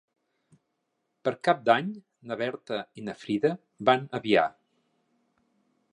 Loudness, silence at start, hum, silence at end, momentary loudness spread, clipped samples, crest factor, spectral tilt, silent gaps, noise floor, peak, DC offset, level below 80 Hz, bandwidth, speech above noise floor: -27 LUFS; 1.25 s; none; 1.45 s; 14 LU; under 0.1%; 24 dB; -6 dB/octave; none; -79 dBFS; -6 dBFS; under 0.1%; -74 dBFS; 10.5 kHz; 52 dB